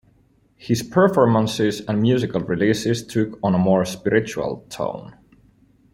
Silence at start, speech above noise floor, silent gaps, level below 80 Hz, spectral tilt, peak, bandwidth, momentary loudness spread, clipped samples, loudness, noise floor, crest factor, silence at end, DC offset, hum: 0.6 s; 39 dB; none; -54 dBFS; -6 dB/octave; -2 dBFS; 16 kHz; 11 LU; under 0.1%; -20 LUFS; -58 dBFS; 18 dB; 0.8 s; under 0.1%; none